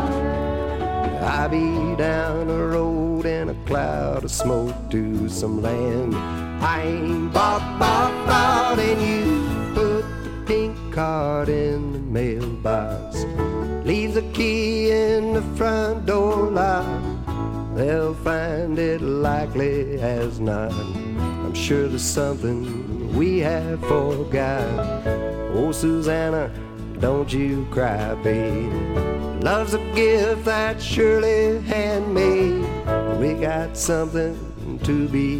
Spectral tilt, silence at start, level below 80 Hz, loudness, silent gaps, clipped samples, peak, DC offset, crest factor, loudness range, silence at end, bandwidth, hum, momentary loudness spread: -6 dB/octave; 0 s; -34 dBFS; -22 LUFS; none; under 0.1%; -4 dBFS; under 0.1%; 18 dB; 4 LU; 0 s; 16.5 kHz; none; 7 LU